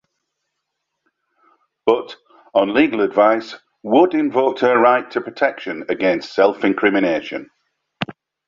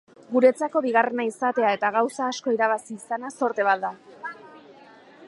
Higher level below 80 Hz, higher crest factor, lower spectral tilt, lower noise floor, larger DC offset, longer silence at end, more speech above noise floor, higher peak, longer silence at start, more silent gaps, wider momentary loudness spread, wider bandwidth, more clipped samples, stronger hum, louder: first, -62 dBFS vs -82 dBFS; about the same, 18 dB vs 20 dB; first, -6.5 dB/octave vs -4 dB/octave; first, -77 dBFS vs -50 dBFS; neither; first, 0.35 s vs 0 s; first, 60 dB vs 27 dB; first, -2 dBFS vs -6 dBFS; first, 1.85 s vs 0.3 s; neither; about the same, 15 LU vs 16 LU; second, 7.4 kHz vs 11.5 kHz; neither; neither; first, -17 LUFS vs -24 LUFS